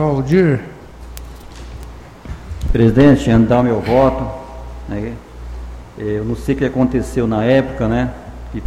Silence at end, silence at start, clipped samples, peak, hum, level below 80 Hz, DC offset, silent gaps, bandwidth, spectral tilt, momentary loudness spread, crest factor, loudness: 0 s; 0 s; under 0.1%; 0 dBFS; none; -30 dBFS; under 0.1%; none; 15.5 kHz; -8 dB/octave; 22 LU; 16 dB; -15 LUFS